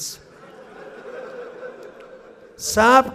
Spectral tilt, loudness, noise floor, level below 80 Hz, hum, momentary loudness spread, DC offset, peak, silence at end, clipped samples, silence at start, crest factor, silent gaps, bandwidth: -2.5 dB/octave; -18 LUFS; -44 dBFS; -54 dBFS; none; 28 LU; under 0.1%; -2 dBFS; 0 s; under 0.1%; 0 s; 22 dB; none; 15.5 kHz